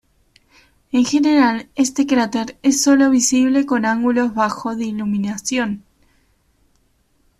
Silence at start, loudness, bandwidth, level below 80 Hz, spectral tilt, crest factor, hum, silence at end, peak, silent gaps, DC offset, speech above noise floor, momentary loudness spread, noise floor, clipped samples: 0.95 s; -17 LUFS; 14 kHz; -56 dBFS; -3.5 dB/octave; 14 dB; none; 1.6 s; -4 dBFS; none; under 0.1%; 44 dB; 9 LU; -61 dBFS; under 0.1%